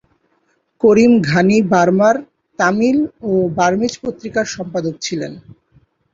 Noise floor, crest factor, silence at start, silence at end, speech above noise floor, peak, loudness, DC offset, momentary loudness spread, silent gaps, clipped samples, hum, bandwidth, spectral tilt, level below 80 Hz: -63 dBFS; 14 dB; 0.85 s; 0.75 s; 48 dB; -2 dBFS; -15 LUFS; under 0.1%; 11 LU; none; under 0.1%; none; 7.8 kHz; -6 dB/octave; -52 dBFS